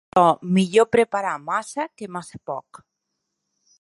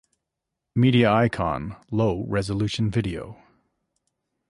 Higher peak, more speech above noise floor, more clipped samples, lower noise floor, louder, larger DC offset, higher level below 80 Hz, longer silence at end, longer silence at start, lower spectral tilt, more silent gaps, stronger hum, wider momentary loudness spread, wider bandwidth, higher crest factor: first, -2 dBFS vs -8 dBFS; about the same, 58 dB vs 61 dB; neither; second, -79 dBFS vs -83 dBFS; about the same, -21 LUFS vs -23 LUFS; neither; second, -64 dBFS vs -46 dBFS; about the same, 1.2 s vs 1.15 s; second, 0.15 s vs 0.75 s; about the same, -6 dB/octave vs -7 dB/octave; neither; neither; first, 16 LU vs 13 LU; about the same, 11.5 kHz vs 11.5 kHz; about the same, 20 dB vs 18 dB